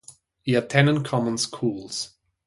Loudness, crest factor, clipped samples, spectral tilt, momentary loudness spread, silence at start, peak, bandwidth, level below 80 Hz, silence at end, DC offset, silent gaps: -24 LUFS; 20 dB; under 0.1%; -5 dB/octave; 12 LU; 0.1 s; -4 dBFS; 11.5 kHz; -62 dBFS; 0.4 s; under 0.1%; none